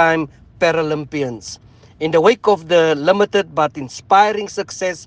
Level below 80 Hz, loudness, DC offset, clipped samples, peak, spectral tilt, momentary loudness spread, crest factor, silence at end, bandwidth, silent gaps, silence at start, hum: -54 dBFS; -16 LUFS; under 0.1%; under 0.1%; 0 dBFS; -4.5 dB/octave; 14 LU; 16 dB; 0 s; 9.6 kHz; none; 0 s; none